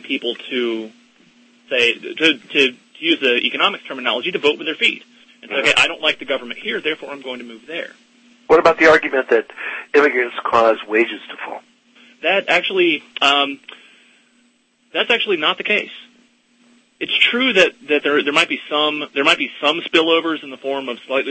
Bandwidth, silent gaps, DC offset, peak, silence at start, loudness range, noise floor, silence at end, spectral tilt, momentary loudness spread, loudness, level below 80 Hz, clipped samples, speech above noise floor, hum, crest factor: 8.8 kHz; none; under 0.1%; 0 dBFS; 0.05 s; 4 LU; -59 dBFS; 0 s; -3 dB/octave; 15 LU; -17 LUFS; -60 dBFS; under 0.1%; 41 dB; none; 18 dB